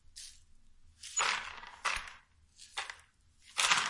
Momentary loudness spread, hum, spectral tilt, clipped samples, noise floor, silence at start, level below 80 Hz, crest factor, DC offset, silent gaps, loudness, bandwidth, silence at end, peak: 19 LU; none; 1.5 dB/octave; under 0.1%; -64 dBFS; 0.15 s; -62 dBFS; 26 dB; under 0.1%; none; -35 LUFS; 11.5 kHz; 0 s; -12 dBFS